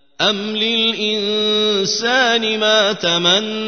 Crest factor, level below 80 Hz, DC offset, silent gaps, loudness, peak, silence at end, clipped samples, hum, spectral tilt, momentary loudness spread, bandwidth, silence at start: 16 dB; -64 dBFS; 0.3%; none; -15 LUFS; 0 dBFS; 0 s; under 0.1%; none; -2.5 dB/octave; 4 LU; 6.6 kHz; 0.2 s